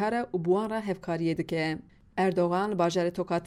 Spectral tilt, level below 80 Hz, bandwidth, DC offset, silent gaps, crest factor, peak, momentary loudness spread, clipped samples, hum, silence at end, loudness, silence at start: -6.5 dB/octave; -60 dBFS; 12.5 kHz; under 0.1%; none; 14 dB; -14 dBFS; 6 LU; under 0.1%; none; 0 s; -29 LUFS; 0 s